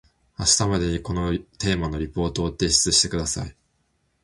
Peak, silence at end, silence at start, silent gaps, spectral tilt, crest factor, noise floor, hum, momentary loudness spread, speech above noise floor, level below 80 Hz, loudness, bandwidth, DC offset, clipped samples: -4 dBFS; 0.75 s; 0.4 s; none; -3 dB/octave; 22 dB; -69 dBFS; none; 10 LU; 46 dB; -38 dBFS; -22 LUFS; 11.5 kHz; under 0.1%; under 0.1%